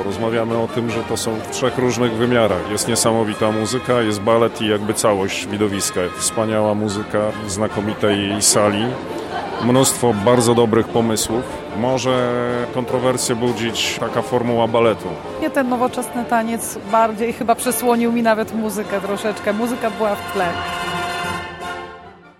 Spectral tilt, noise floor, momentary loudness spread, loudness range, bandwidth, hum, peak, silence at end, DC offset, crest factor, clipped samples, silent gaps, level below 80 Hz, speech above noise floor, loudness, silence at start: -4 dB/octave; -39 dBFS; 8 LU; 3 LU; 16.5 kHz; none; -2 dBFS; 0.1 s; under 0.1%; 16 dB; under 0.1%; none; -50 dBFS; 21 dB; -18 LUFS; 0 s